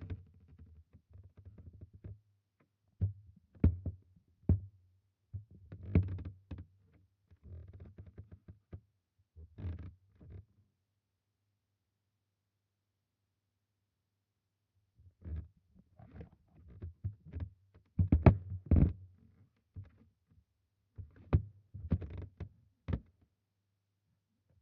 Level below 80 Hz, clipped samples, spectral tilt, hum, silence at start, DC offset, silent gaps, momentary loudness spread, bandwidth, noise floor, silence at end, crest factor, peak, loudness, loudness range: -48 dBFS; under 0.1%; -10.5 dB/octave; none; 0 s; under 0.1%; none; 25 LU; 4.3 kHz; -86 dBFS; 1.6 s; 34 dB; -6 dBFS; -36 LUFS; 21 LU